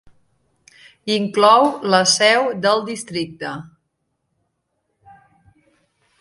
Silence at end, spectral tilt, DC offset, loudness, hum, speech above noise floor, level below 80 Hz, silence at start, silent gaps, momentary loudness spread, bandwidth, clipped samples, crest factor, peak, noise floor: 2.6 s; -3 dB/octave; under 0.1%; -16 LUFS; none; 56 dB; -66 dBFS; 1.05 s; none; 17 LU; 11.5 kHz; under 0.1%; 20 dB; 0 dBFS; -73 dBFS